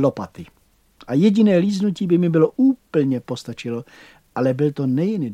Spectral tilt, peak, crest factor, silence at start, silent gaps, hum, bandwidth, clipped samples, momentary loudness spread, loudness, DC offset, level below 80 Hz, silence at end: -8 dB/octave; -4 dBFS; 16 dB; 0 s; none; none; 10.5 kHz; under 0.1%; 14 LU; -19 LUFS; under 0.1%; -60 dBFS; 0 s